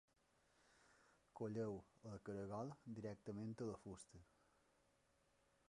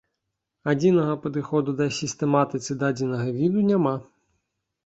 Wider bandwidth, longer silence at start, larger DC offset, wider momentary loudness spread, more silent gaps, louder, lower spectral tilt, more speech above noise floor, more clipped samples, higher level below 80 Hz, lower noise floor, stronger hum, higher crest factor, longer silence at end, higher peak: first, 11 kHz vs 8.2 kHz; about the same, 0.75 s vs 0.65 s; neither; first, 12 LU vs 6 LU; neither; second, -52 LUFS vs -24 LUFS; about the same, -7.5 dB/octave vs -6.5 dB/octave; second, 30 dB vs 58 dB; neither; second, -78 dBFS vs -64 dBFS; about the same, -81 dBFS vs -81 dBFS; neither; about the same, 18 dB vs 18 dB; first, 1.5 s vs 0.85 s; second, -36 dBFS vs -6 dBFS